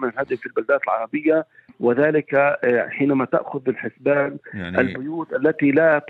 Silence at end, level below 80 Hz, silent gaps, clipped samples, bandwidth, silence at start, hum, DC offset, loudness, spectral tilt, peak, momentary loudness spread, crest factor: 0 s; -64 dBFS; none; under 0.1%; 4.5 kHz; 0 s; none; under 0.1%; -21 LUFS; -9.5 dB/octave; -4 dBFS; 8 LU; 16 dB